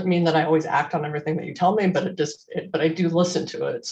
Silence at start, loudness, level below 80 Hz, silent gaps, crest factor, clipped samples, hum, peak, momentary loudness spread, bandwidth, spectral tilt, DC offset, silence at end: 0 s; -23 LUFS; -68 dBFS; none; 16 dB; under 0.1%; none; -6 dBFS; 8 LU; 8.6 kHz; -6 dB/octave; under 0.1%; 0 s